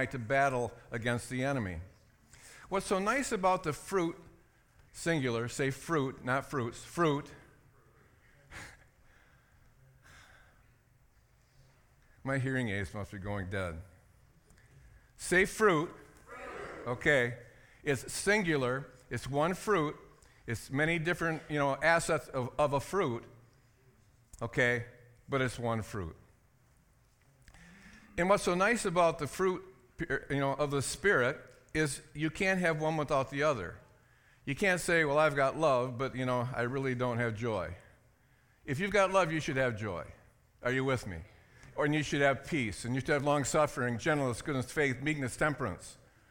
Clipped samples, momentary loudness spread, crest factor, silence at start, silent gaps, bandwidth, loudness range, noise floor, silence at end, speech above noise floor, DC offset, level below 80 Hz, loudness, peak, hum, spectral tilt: under 0.1%; 15 LU; 20 dB; 0 s; none; 18 kHz; 8 LU; -67 dBFS; 0.35 s; 35 dB; under 0.1%; -58 dBFS; -32 LUFS; -12 dBFS; none; -5 dB/octave